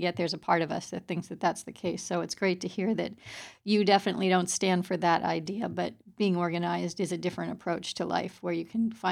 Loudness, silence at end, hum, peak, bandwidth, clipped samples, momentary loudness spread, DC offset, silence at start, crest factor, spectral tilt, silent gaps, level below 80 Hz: -30 LUFS; 0 s; none; -10 dBFS; 14.5 kHz; under 0.1%; 9 LU; under 0.1%; 0 s; 20 dB; -4.5 dB/octave; none; -70 dBFS